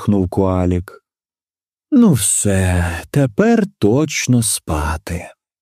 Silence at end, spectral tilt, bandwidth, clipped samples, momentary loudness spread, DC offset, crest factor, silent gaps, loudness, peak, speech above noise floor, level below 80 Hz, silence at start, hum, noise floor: 0.3 s; -5 dB/octave; 15.5 kHz; under 0.1%; 9 LU; under 0.1%; 16 dB; none; -16 LUFS; 0 dBFS; over 75 dB; -34 dBFS; 0 s; none; under -90 dBFS